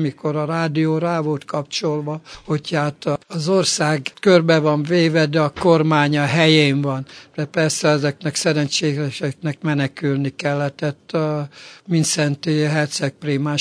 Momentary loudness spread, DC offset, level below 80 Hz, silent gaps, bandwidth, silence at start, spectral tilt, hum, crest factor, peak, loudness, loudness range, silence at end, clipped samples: 10 LU; under 0.1%; -60 dBFS; none; 11 kHz; 0 s; -5 dB/octave; none; 18 dB; 0 dBFS; -19 LUFS; 6 LU; 0 s; under 0.1%